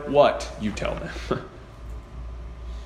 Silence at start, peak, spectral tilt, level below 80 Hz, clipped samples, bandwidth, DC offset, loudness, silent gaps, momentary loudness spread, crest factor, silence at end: 0 s; -4 dBFS; -5.5 dB/octave; -38 dBFS; under 0.1%; 11.5 kHz; under 0.1%; -25 LUFS; none; 21 LU; 22 dB; 0 s